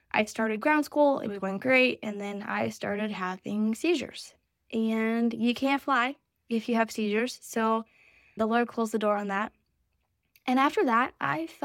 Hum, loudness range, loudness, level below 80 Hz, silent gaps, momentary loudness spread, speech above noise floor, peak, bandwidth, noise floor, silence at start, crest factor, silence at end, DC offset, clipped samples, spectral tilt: none; 3 LU; -28 LUFS; -72 dBFS; none; 9 LU; 48 dB; -8 dBFS; 16 kHz; -76 dBFS; 0.15 s; 20 dB; 0.1 s; under 0.1%; under 0.1%; -5 dB/octave